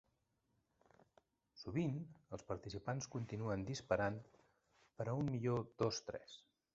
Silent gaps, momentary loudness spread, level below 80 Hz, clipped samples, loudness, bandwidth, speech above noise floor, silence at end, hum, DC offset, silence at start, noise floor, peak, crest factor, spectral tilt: none; 14 LU; -68 dBFS; under 0.1%; -43 LUFS; 8 kHz; 41 dB; 0.35 s; none; under 0.1%; 1.55 s; -83 dBFS; -22 dBFS; 24 dB; -6 dB/octave